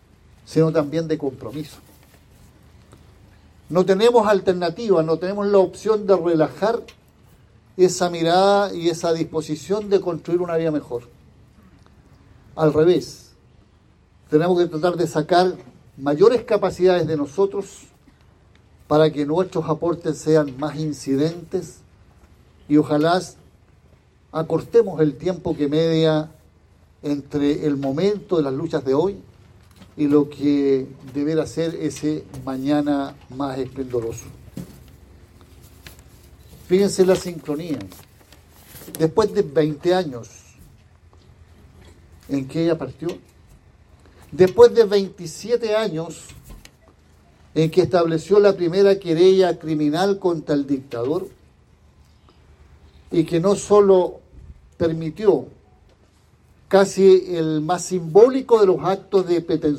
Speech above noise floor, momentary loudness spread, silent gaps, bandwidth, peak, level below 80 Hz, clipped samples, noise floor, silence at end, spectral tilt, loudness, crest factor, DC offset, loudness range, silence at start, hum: 36 dB; 15 LU; none; 14 kHz; 0 dBFS; -52 dBFS; under 0.1%; -55 dBFS; 0 s; -6.5 dB/octave; -20 LUFS; 20 dB; under 0.1%; 8 LU; 0.5 s; none